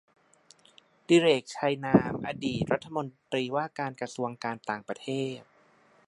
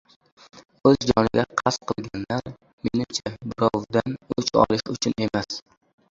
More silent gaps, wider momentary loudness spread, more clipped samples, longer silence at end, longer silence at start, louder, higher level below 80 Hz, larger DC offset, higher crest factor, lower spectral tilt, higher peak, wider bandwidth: second, none vs 2.73-2.78 s; about the same, 12 LU vs 10 LU; neither; first, 0.65 s vs 0.5 s; first, 1.1 s vs 0.55 s; second, -29 LUFS vs -24 LUFS; second, -62 dBFS vs -50 dBFS; neither; about the same, 22 dB vs 22 dB; about the same, -5.5 dB/octave vs -5 dB/octave; second, -8 dBFS vs -2 dBFS; first, 11.5 kHz vs 7.8 kHz